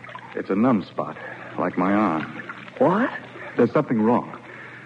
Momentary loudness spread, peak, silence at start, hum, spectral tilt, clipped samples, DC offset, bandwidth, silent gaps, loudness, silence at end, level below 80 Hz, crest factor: 15 LU; -6 dBFS; 0 s; none; -8.5 dB/octave; under 0.1%; under 0.1%; 7.6 kHz; none; -23 LUFS; 0 s; -66 dBFS; 18 dB